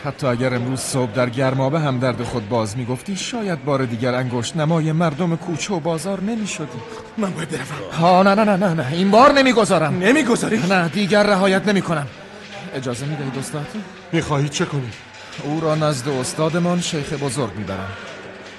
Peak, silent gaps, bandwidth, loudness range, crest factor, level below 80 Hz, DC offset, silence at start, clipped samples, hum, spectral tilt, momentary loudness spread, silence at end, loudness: -2 dBFS; none; 12.5 kHz; 8 LU; 18 dB; -52 dBFS; under 0.1%; 0 s; under 0.1%; none; -5.5 dB/octave; 14 LU; 0 s; -19 LUFS